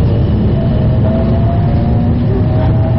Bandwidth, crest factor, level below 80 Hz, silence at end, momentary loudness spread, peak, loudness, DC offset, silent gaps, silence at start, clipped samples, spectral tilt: 5.4 kHz; 6 dB; -18 dBFS; 0 s; 1 LU; -6 dBFS; -12 LUFS; 2%; none; 0 s; under 0.1%; -9.5 dB/octave